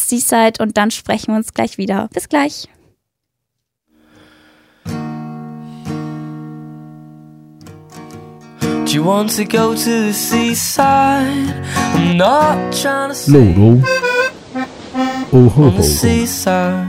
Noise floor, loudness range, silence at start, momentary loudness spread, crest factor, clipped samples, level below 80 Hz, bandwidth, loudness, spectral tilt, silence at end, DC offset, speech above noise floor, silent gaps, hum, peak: -76 dBFS; 17 LU; 0 s; 20 LU; 14 dB; under 0.1%; -38 dBFS; 16.5 kHz; -14 LUFS; -5 dB/octave; 0 s; under 0.1%; 63 dB; none; none; 0 dBFS